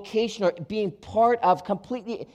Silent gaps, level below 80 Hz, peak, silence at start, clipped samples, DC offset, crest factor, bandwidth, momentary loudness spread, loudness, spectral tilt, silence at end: none; -60 dBFS; -10 dBFS; 0 s; under 0.1%; under 0.1%; 16 dB; 10.5 kHz; 10 LU; -25 LUFS; -6 dB/octave; 0.1 s